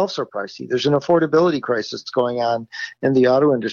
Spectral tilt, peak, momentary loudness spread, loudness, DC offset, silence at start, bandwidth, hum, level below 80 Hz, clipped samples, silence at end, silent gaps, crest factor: -6 dB/octave; -6 dBFS; 10 LU; -19 LUFS; under 0.1%; 0 s; 7.2 kHz; none; -62 dBFS; under 0.1%; 0 s; none; 12 dB